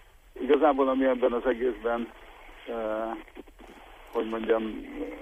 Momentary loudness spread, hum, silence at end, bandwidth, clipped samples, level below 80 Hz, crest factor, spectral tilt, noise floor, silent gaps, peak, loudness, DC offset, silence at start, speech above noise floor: 17 LU; none; 0 s; 14.5 kHz; under 0.1%; -52 dBFS; 18 dB; -6 dB/octave; -50 dBFS; none; -10 dBFS; -28 LUFS; under 0.1%; 0.35 s; 22 dB